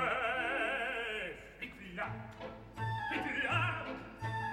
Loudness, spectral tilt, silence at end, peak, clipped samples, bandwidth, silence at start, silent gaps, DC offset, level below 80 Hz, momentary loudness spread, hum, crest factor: -37 LUFS; -5.5 dB/octave; 0 s; -20 dBFS; under 0.1%; 16 kHz; 0 s; none; under 0.1%; -60 dBFS; 13 LU; none; 18 dB